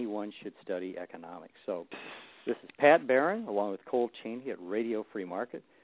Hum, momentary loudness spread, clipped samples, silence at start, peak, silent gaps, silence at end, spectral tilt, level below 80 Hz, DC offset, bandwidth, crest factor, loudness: none; 20 LU; under 0.1%; 0 s; -8 dBFS; none; 0.25 s; -3.5 dB/octave; -80 dBFS; under 0.1%; 4 kHz; 24 dB; -32 LUFS